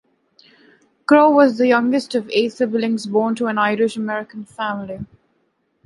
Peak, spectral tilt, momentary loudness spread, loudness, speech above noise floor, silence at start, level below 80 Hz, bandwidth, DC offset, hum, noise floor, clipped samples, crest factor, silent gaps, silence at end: -2 dBFS; -5.5 dB/octave; 17 LU; -18 LUFS; 49 dB; 1.1 s; -62 dBFS; 11.5 kHz; under 0.1%; none; -66 dBFS; under 0.1%; 18 dB; none; 0.8 s